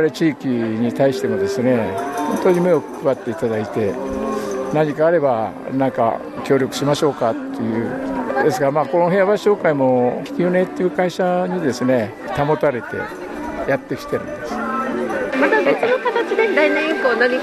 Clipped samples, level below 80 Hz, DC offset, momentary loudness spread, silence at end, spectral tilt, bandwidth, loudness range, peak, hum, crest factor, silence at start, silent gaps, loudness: under 0.1%; -52 dBFS; under 0.1%; 8 LU; 0 s; -6 dB/octave; 13 kHz; 3 LU; -2 dBFS; none; 16 dB; 0 s; none; -19 LUFS